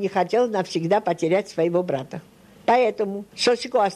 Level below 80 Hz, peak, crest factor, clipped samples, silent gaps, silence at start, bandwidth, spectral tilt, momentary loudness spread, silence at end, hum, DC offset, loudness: -66 dBFS; -6 dBFS; 16 dB; under 0.1%; none; 0 s; 12.5 kHz; -5 dB/octave; 9 LU; 0 s; none; under 0.1%; -22 LUFS